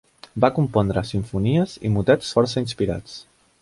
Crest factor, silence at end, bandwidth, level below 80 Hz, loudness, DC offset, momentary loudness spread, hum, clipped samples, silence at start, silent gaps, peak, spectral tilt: 20 dB; 0.4 s; 11.5 kHz; -44 dBFS; -22 LUFS; under 0.1%; 13 LU; none; under 0.1%; 0.35 s; none; -2 dBFS; -7 dB/octave